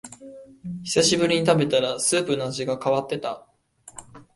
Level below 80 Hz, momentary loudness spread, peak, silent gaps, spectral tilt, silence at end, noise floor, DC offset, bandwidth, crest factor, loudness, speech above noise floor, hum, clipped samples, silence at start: -60 dBFS; 23 LU; -6 dBFS; none; -3.5 dB/octave; 0.15 s; -47 dBFS; under 0.1%; 11.5 kHz; 18 dB; -22 LUFS; 24 dB; none; under 0.1%; 0.05 s